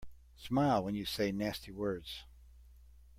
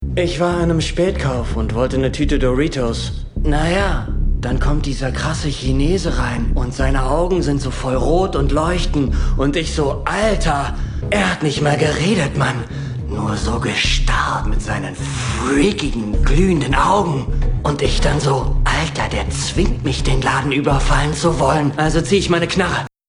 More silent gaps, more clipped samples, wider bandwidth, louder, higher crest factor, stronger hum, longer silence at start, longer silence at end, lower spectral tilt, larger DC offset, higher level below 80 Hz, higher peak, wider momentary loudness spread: neither; neither; first, 16.5 kHz vs 10.5 kHz; second, -35 LUFS vs -18 LUFS; about the same, 18 dB vs 14 dB; neither; about the same, 0 s vs 0 s; about the same, 0.15 s vs 0.2 s; about the same, -6 dB/octave vs -5.5 dB/octave; neither; second, -56 dBFS vs -22 dBFS; second, -20 dBFS vs -2 dBFS; first, 16 LU vs 6 LU